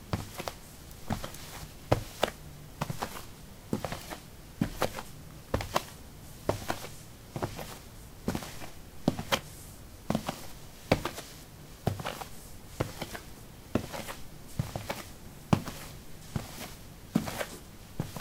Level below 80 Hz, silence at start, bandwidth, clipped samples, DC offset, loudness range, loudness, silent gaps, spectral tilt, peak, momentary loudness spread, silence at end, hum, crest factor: -50 dBFS; 0 s; 17 kHz; under 0.1%; under 0.1%; 3 LU; -36 LUFS; none; -5 dB/octave; -6 dBFS; 17 LU; 0 s; none; 30 dB